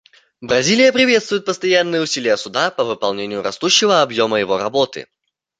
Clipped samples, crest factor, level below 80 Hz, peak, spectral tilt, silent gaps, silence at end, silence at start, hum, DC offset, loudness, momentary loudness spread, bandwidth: under 0.1%; 16 dB; -60 dBFS; 0 dBFS; -3 dB/octave; none; 0.55 s; 0.4 s; none; under 0.1%; -16 LUFS; 9 LU; 9.4 kHz